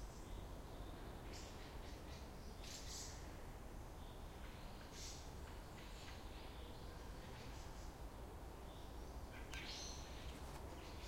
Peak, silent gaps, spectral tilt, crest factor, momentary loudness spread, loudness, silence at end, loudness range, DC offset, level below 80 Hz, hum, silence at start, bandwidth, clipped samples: -32 dBFS; none; -4 dB/octave; 20 dB; 5 LU; -54 LUFS; 0 s; 2 LU; under 0.1%; -56 dBFS; none; 0 s; 16.5 kHz; under 0.1%